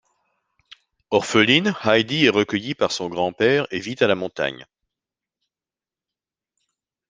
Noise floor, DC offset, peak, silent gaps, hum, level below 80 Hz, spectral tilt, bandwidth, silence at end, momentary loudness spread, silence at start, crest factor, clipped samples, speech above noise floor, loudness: under -90 dBFS; under 0.1%; -2 dBFS; none; none; -62 dBFS; -4.5 dB/octave; 9.8 kHz; 2.45 s; 10 LU; 1.1 s; 22 dB; under 0.1%; over 70 dB; -20 LUFS